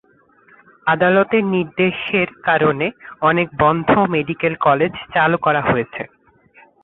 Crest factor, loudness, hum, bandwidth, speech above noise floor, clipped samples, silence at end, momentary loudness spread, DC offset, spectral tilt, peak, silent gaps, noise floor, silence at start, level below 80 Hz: 16 dB; -17 LUFS; none; 4.1 kHz; 36 dB; under 0.1%; 0.8 s; 7 LU; under 0.1%; -10.5 dB/octave; -2 dBFS; none; -53 dBFS; 0.85 s; -50 dBFS